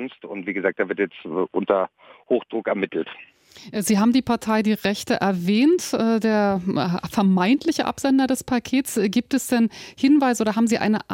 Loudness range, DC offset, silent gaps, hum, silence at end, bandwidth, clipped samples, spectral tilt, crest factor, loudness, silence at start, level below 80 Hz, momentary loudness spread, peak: 5 LU; under 0.1%; none; none; 0 s; 17 kHz; under 0.1%; -5 dB/octave; 16 dB; -21 LUFS; 0 s; -58 dBFS; 8 LU; -6 dBFS